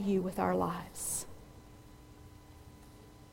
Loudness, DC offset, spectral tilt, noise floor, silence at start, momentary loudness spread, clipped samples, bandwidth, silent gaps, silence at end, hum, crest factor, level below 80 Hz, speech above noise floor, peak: -35 LUFS; under 0.1%; -5 dB/octave; -55 dBFS; 0 s; 24 LU; under 0.1%; 16.5 kHz; none; 0 s; none; 20 dB; -58 dBFS; 22 dB; -18 dBFS